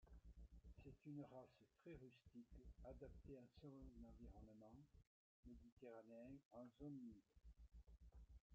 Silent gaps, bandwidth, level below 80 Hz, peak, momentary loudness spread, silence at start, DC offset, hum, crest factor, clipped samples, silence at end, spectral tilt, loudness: 5.07-5.43 s, 5.72-5.77 s, 6.45-6.51 s, 8.41-8.50 s; 7 kHz; -70 dBFS; -46 dBFS; 9 LU; 0 s; under 0.1%; none; 18 dB; under 0.1%; 0 s; -8 dB/octave; -64 LUFS